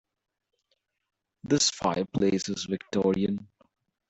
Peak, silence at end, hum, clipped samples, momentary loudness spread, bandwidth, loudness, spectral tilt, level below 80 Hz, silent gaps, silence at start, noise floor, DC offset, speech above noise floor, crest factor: -10 dBFS; 0.65 s; none; under 0.1%; 8 LU; 8.4 kHz; -27 LUFS; -4 dB/octave; -62 dBFS; none; 1.45 s; -77 dBFS; under 0.1%; 50 dB; 20 dB